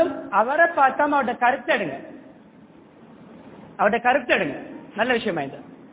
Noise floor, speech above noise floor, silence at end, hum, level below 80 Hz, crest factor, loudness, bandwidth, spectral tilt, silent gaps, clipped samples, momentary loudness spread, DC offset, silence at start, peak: -49 dBFS; 28 dB; 0.05 s; none; -62 dBFS; 20 dB; -21 LUFS; 4 kHz; -8.5 dB/octave; none; under 0.1%; 18 LU; under 0.1%; 0 s; -4 dBFS